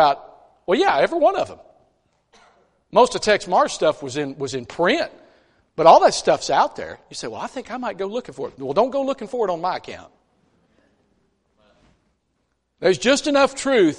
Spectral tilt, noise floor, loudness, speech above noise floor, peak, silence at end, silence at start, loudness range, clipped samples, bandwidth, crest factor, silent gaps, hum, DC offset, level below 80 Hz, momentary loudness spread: -3.5 dB/octave; -71 dBFS; -20 LUFS; 51 dB; 0 dBFS; 0 s; 0 s; 9 LU; under 0.1%; 11.5 kHz; 22 dB; none; none; under 0.1%; -56 dBFS; 14 LU